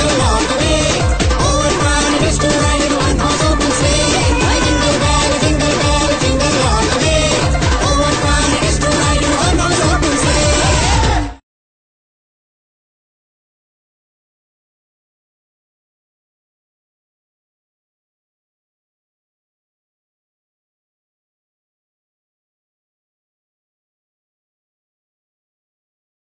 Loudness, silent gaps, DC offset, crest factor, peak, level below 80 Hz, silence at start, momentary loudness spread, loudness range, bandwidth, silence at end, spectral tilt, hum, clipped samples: -13 LUFS; none; under 0.1%; 16 dB; -2 dBFS; -24 dBFS; 0 s; 2 LU; 4 LU; 9.4 kHz; 14.85 s; -4 dB/octave; none; under 0.1%